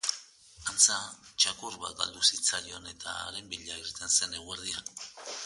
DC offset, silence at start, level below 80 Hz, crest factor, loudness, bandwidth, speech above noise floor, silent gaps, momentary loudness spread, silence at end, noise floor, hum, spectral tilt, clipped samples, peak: under 0.1%; 0.05 s; -64 dBFS; 26 dB; -29 LUFS; 12 kHz; 20 dB; none; 17 LU; 0 s; -52 dBFS; none; 1.5 dB/octave; under 0.1%; -8 dBFS